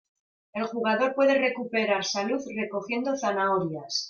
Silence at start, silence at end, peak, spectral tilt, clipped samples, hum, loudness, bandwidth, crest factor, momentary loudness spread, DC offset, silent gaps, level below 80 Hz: 0.55 s; 0 s; -12 dBFS; -4 dB/octave; under 0.1%; none; -26 LUFS; 7.2 kHz; 14 dB; 9 LU; under 0.1%; none; -74 dBFS